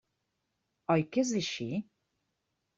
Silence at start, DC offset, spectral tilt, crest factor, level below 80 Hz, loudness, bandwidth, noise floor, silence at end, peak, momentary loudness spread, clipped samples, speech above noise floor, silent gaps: 0.9 s; under 0.1%; -5 dB/octave; 20 dB; -72 dBFS; -32 LUFS; 7.6 kHz; -82 dBFS; 0.95 s; -14 dBFS; 10 LU; under 0.1%; 52 dB; none